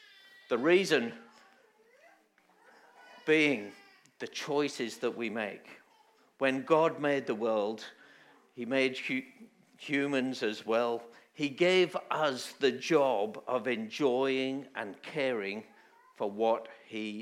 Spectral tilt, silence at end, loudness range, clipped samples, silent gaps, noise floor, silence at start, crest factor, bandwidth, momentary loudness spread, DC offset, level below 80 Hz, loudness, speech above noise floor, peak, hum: -4.5 dB/octave; 0 s; 4 LU; under 0.1%; none; -67 dBFS; 0.5 s; 20 dB; 14.5 kHz; 14 LU; under 0.1%; under -90 dBFS; -31 LUFS; 36 dB; -12 dBFS; none